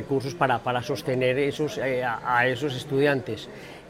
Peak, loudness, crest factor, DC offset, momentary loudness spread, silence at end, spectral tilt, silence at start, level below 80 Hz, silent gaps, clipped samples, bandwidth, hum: -6 dBFS; -25 LUFS; 18 dB; under 0.1%; 6 LU; 0 s; -5.5 dB/octave; 0 s; -58 dBFS; none; under 0.1%; 16 kHz; none